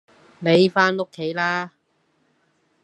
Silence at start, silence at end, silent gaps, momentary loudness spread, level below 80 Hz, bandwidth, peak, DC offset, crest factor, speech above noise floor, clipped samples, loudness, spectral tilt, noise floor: 0.4 s; 1.15 s; none; 11 LU; -72 dBFS; 9.4 kHz; -2 dBFS; under 0.1%; 20 dB; 47 dB; under 0.1%; -20 LUFS; -6 dB/octave; -67 dBFS